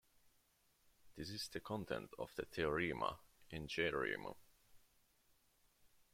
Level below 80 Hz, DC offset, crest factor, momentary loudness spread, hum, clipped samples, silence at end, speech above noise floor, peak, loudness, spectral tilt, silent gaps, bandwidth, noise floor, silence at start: -68 dBFS; under 0.1%; 22 dB; 14 LU; none; under 0.1%; 0.3 s; 33 dB; -24 dBFS; -44 LUFS; -4.5 dB/octave; none; 16.5 kHz; -77 dBFS; 1.05 s